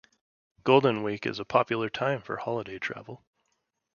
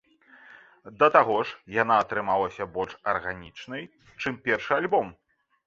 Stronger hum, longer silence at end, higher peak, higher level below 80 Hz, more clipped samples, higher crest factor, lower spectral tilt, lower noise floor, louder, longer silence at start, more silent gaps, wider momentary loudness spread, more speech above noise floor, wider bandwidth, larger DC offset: neither; first, 0.8 s vs 0.55 s; about the same, -6 dBFS vs -4 dBFS; second, -68 dBFS vs -62 dBFS; neither; about the same, 24 dB vs 24 dB; about the same, -6.5 dB/octave vs -5.5 dB/octave; first, -78 dBFS vs -54 dBFS; second, -28 LUFS vs -25 LUFS; second, 0.65 s vs 0.85 s; neither; second, 13 LU vs 18 LU; first, 51 dB vs 28 dB; about the same, 7 kHz vs 7.6 kHz; neither